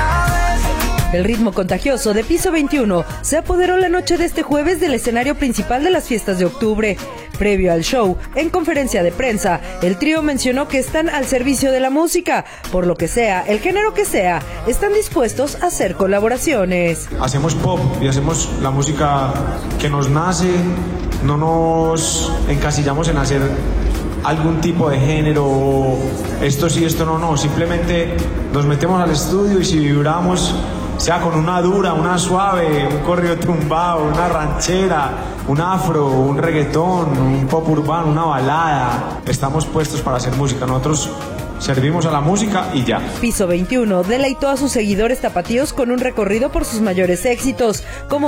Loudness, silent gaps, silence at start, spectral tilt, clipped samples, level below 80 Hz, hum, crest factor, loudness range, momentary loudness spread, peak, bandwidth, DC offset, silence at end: -17 LUFS; none; 0 s; -5.5 dB/octave; under 0.1%; -28 dBFS; none; 12 dB; 1 LU; 4 LU; -4 dBFS; 17.5 kHz; under 0.1%; 0 s